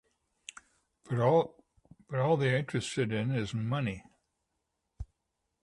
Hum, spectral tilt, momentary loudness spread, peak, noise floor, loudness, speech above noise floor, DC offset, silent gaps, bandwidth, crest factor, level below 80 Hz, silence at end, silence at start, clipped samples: none; -6.5 dB/octave; 22 LU; -14 dBFS; -83 dBFS; -31 LUFS; 53 dB; under 0.1%; none; 11.5 kHz; 20 dB; -58 dBFS; 0.6 s; 1.1 s; under 0.1%